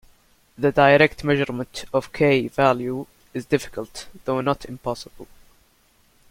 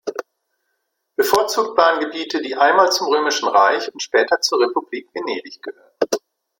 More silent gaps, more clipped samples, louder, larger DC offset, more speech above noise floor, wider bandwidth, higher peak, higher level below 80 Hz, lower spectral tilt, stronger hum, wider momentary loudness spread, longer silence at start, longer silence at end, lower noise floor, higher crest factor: neither; neither; second, -21 LUFS vs -18 LUFS; neither; second, 38 dB vs 55 dB; about the same, 16.5 kHz vs 16.5 kHz; about the same, -2 dBFS vs 0 dBFS; first, -50 dBFS vs -66 dBFS; first, -6 dB/octave vs -1.5 dB/octave; neither; first, 18 LU vs 14 LU; first, 0.6 s vs 0.05 s; first, 1.05 s vs 0.4 s; second, -60 dBFS vs -73 dBFS; about the same, 20 dB vs 18 dB